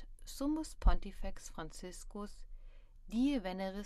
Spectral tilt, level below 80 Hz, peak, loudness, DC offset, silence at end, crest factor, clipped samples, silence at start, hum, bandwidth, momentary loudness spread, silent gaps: -5.5 dB/octave; -40 dBFS; -16 dBFS; -40 LUFS; under 0.1%; 0 s; 20 dB; under 0.1%; 0 s; none; 13.5 kHz; 16 LU; none